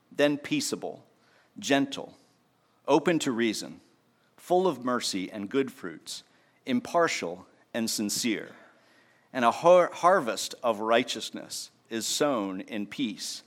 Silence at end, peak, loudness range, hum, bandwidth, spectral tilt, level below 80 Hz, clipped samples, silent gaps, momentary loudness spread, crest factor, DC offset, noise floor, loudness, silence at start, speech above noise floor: 0.05 s; -8 dBFS; 5 LU; none; 16.5 kHz; -3.5 dB/octave; -80 dBFS; under 0.1%; none; 16 LU; 20 dB; under 0.1%; -67 dBFS; -28 LUFS; 0.1 s; 40 dB